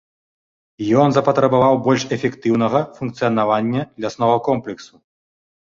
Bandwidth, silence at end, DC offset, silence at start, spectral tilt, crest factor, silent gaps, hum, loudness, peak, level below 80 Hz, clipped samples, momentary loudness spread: 7.6 kHz; 0.9 s; under 0.1%; 0.8 s; -6.5 dB/octave; 18 dB; none; none; -18 LUFS; -2 dBFS; -56 dBFS; under 0.1%; 12 LU